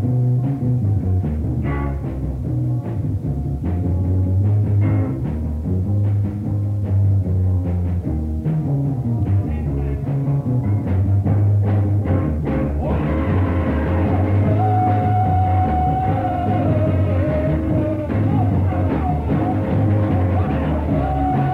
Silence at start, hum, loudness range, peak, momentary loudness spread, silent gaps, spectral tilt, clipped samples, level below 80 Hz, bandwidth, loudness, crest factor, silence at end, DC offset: 0 s; none; 3 LU; -6 dBFS; 5 LU; none; -10.5 dB/octave; under 0.1%; -30 dBFS; 3.8 kHz; -19 LUFS; 12 dB; 0 s; under 0.1%